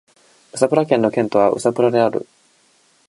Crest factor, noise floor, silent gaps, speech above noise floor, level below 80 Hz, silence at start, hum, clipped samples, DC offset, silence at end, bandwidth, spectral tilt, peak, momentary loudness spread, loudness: 18 dB; -57 dBFS; none; 41 dB; -64 dBFS; 0.55 s; none; under 0.1%; under 0.1%; 0.85 s; 11.5 kHz; -6 dB/octave; 0 dBFS; 6 LU; -17 LUFS